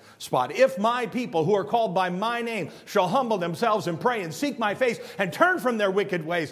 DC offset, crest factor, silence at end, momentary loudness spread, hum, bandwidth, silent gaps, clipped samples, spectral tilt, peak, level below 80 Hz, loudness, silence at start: under 0.1%; 20 dB; 0 s; 7 LU; none; 16 kHz; none; under 0.1%; -5 dB/octave; -4 dBFS; -72 dBFS; -25 LUFS; 0.2 s